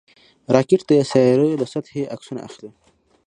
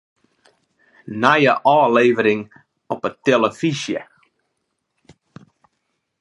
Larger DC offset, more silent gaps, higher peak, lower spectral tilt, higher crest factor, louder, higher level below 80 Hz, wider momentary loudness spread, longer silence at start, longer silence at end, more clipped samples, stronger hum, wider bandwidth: neither; neither; about the same, 0 dBFS vs 0 dBFS; first, -7 dB/octave vs -5.5 dB/octave; about the same, 20 dB vs 20 dB; about the same, -18 LUFS vs -17 LUFS; first, -60 dBFS vs -68 dBFS; about the same, 17 LU vs 15 LU; second, 0.5 s vs 1.05 s; second, 0.6 s vs 2.15 s; neither; neither; about the same, 10.5 kHz vs 11.5 kHz